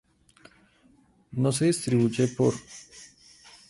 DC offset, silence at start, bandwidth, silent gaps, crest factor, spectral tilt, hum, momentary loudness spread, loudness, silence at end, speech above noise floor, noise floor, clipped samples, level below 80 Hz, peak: under 0.1%; 1.3 s; 11.5 kHz; none; 16 dB; -6 dB/octave; none; 21 LU; -25 LUFS; 0.65 s; 36 dB; -61 dBFS; under 0.1%; -62 dBFS; -12 dBFS